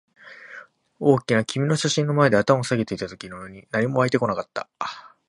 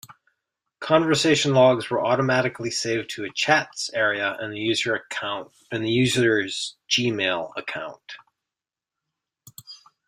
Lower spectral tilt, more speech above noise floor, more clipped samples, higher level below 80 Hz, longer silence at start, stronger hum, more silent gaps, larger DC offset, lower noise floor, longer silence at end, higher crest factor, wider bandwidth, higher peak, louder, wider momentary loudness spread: first, -5.5 dB/octave vs -4 dB/octave; second, 23 dB vs 66 dB; neither; about the same, -60 dBFS vs -62 dBFS; first, 0.25 s vs 0.1 s; neither; neither; neither; second, -45 dBFS vs -89 dBFS; about the same, 0.2 s vs 0.3 s; about the same, 22 dB vs 20 dB; second, 11.5 kHz vs 15.5 kHz; about the same, -2 dBFS vs -4 dBFS; about the same, -22 LUFS vs -22 LUFS; first, 19 LU vs 15 LU